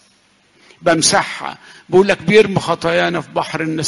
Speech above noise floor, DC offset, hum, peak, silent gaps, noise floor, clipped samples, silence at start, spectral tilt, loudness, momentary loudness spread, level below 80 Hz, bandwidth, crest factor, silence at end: 39 dB; under 0.1%; none; 0 dBFS; none; -54 dBFS; under 0.1%; 0.8 s; -3.5 dB/octave; -15 LUFS; 10 LU; -50 dBFS; 11.5 kHz; 16 dB; 0 s